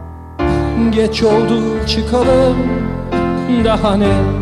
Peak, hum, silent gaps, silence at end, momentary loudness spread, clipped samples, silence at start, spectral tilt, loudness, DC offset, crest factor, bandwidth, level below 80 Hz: -2 dBFS; none; none; 0 s; 6 LU; under 0.1%; 0 s; -7 dB/octave; -14 LUFS; under 0.1%; 12 dB; 11.5 kHz; -26 dBFS